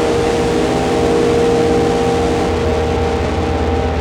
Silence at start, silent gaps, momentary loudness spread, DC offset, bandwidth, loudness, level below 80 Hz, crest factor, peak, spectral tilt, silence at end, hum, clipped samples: 0 s; none; 4 LU; under 0.1%; 13.5 kHz; -15 LUFS; -26 dBFS; 12 dB; -2 dBFS; -6 dB/octave; 0 s; none; under 0.1%